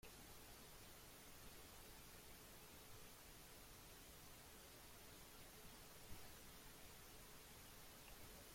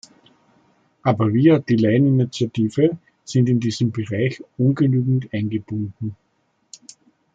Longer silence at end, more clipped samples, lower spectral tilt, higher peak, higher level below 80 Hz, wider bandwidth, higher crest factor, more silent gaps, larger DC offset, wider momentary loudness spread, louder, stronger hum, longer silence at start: second, 0 s vs 1.2 s; neither; second, -2.5 dB/octave vs -7.5 dB/octave; second, -42 dBFS vs -2 dBFS; second, -70 dBFS vs -60 dBFS; first, 16.5 kHz vs 7.8 kHz; about the same, 18 dB vs 18 dB; neither; neither; second, 1 LU vs 11 LU; second, -61 LUFS vs -20 LUFS; neither; second, 0 s vs 1.05 s